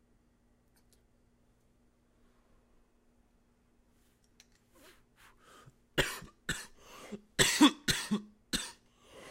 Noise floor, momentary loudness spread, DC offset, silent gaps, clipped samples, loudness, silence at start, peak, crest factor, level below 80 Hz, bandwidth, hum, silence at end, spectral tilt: -70 dBFS; 24 LU; under 0.1%; none; under 0.1%; -31 LUFS; 5.95 s; -10 dBFS; 28 dB; -58 dBFS; 16 kHz; none; 0 s; -2.5 dB/octave